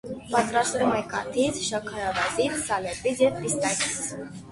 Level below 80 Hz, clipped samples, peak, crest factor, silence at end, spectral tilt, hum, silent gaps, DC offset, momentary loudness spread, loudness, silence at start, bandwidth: -54 dBFS; under 0.1%; -8 dBFS; 18 dB; 0 s; -3 dB/octave; none; none; under 0.1%; 6 LU; -26 LUFS; 0.05 s; 12 kHz